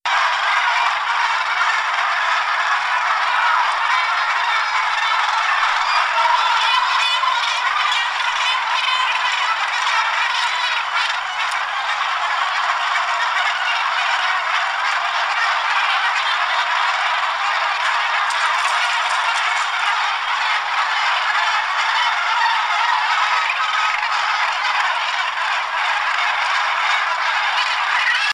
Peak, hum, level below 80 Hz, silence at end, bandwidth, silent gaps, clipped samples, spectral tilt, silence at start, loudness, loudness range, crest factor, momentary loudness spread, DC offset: -4 dBFS; none; -64 dBFS; 0 s; 15.5 kHz; none; under 0.1%; 2.5 dB/octave; 0.05 s; -17 LUFS; 2 LU; 14 dB; 3 LU; under 0.1%